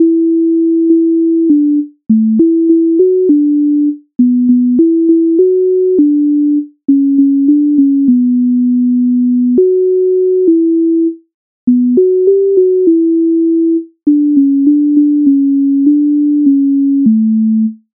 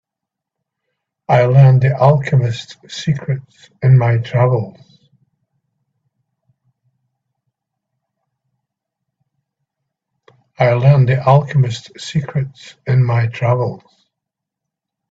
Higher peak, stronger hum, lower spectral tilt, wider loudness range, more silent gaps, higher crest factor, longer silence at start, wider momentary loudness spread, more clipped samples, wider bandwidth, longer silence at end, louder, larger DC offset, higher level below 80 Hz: about the same, 0 dBFS vs 0 dBFS; neither; first, -17.5 dB/octave vs -8 dB/octave; second, 1 LU vs 6 LU; first, 11.34-11.67 s vs none; second, 8 dB vs 16 dB; second, 0 s vs 1.3 s; second, 3 LU vs 14 LU; neither; second, 0.7 kHz vs 7.8 kHz; second, 0.2 s vs 1.35 s; first, -10 LUFS vs -14 LUFS; neither; second, -62 dBFS vs -52 dBFS